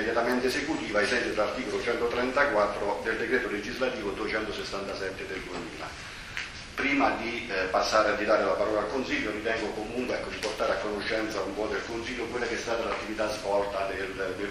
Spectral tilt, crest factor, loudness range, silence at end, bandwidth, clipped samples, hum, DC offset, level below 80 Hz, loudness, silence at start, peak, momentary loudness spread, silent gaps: -4 dB/octave; 20 dB; 4 LU; 0 s; 13.5 kHz; under 0.1%; none; under 0.1%; -50 dBFS; -29 LUFS; 0 s; -10 dBFS; 9 LU; none